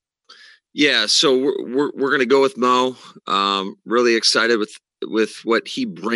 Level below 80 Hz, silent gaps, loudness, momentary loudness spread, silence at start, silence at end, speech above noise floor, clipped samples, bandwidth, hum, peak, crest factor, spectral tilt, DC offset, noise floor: -78 dBFS; none; -18 LUFS; 11 LU; 0.75 s; 0 s; 30 dB; under 0.1%; 12 kHz; none; -4 dBFS; 16 dB; -2.5 dB/octave; under 0.1%; -48 dBFS